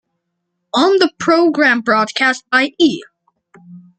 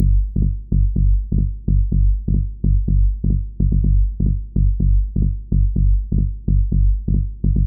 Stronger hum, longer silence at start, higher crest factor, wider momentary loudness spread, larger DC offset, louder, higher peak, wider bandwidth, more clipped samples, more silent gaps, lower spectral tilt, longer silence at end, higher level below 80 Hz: neither; first, 0.75 s vs 0 s; first, 16 dB vs 10 dB; about the same, 4 LU vs 4 LU; second, under 0.1% vs 0.2%; first, -14 LUFS vs -20 LUFS; first, 0 dBFS vs -6 dBFS; first, 9 kHz vs 0.7 kHz; neither; neither; second, -3.5 dB/octave vs -17.5 dB/octave; first, 0.2 s vs 0 s; second, -62 dBFS vs -18 dBFS